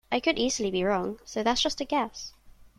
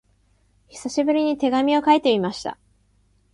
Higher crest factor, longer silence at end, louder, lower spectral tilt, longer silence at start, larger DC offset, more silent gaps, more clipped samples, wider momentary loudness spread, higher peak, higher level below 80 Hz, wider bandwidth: about the same, 18 dB vs 20 dB; second, 0.1 s vs 0.8 s; second, -28 LUFS vs -20 LUFS; second, -3 dB/octave vs -5 dB/octave; second, 0.1 s vs 0.75 s; neither; neither; neither; second, 9 LU vs 15 LU; second, -10 dBFS vs -4 dBFS; first, -52 dBFS vs -60 dBFS; first, 14 kHz vs 11.5 kHz